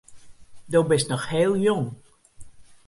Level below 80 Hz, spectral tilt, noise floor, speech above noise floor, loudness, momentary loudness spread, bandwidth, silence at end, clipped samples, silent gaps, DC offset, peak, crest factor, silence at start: -56 dBFS; -5.5 dB/octave; -43 dBFS; 21 dB; -23 LUFS; 6 LU; 11.5 kHz; 0.15 s; under 0.1%; none; under 0.1%; -8 dBFS; 16 dB; 0.1 s